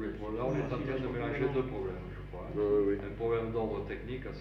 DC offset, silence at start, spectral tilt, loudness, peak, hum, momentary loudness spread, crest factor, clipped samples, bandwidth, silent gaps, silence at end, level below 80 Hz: under 0.1%; 0 s; -9 dB/octave; -34 LUFS; -20 dBFS; none; 10 LU; 14 dB; under 0.1%; 6.6 kHz; none; 0 s; -48 dBFS